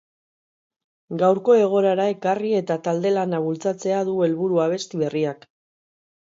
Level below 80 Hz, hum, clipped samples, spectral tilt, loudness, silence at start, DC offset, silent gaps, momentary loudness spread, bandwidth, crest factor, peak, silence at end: -72 dBFS; none; under 0.1%; -6.5 dB/octave; -21 LUFS; 1.1 s; under 0.1%; none; 8 LU; 7.8 kHz; 16 dB; -6 dBFS; 1 s